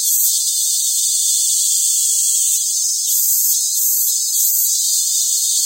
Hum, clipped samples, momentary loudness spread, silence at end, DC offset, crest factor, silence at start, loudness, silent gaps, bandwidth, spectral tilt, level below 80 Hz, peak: none; under 0.1%; 2 LU; 0 s; under 0.1%; 14 dB; 0 s; -13 LUFS; none; 16.5 kHz; 10.5 dB/octave; under -90 dBFS; -2 dBFS